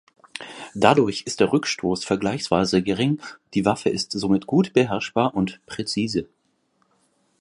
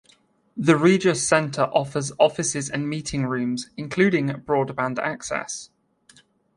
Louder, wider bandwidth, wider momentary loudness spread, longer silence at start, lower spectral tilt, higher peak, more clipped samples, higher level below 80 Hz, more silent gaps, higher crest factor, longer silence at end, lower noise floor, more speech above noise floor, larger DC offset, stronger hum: about the same, -22 LUFS vs -22 LUFS; about the same, 11.5 kHz vs 11.5 kHz; about the same, 10 LU vs 11 LU; second, 0.35 s vs 0.55 s; about the same, -5 dB/octave vs -5 dB/octave; first, 0 dBFS vs -4 dBFS; neither; about the same, -54 dBFS vs -56 dBFS; neither; about the same, 22 dB vs 20 dB; first, 1.15 s vs 0.9 s; first, -67 dBFS vs -60 dBFS; first, 46 dB vs 38 dB; neither; neither